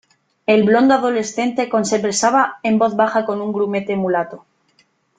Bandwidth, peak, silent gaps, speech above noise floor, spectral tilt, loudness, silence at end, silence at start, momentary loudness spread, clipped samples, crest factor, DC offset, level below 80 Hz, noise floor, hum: 9.6 kHz; -2 dBFS; none; 43 dB; -4.5 dB/octave; -17 LUFS; 0.8 s; 0.5 s; 7 LU; under 0.1%; 16 dB; under 0.1%; -62 dBFS; -60 dBFS; none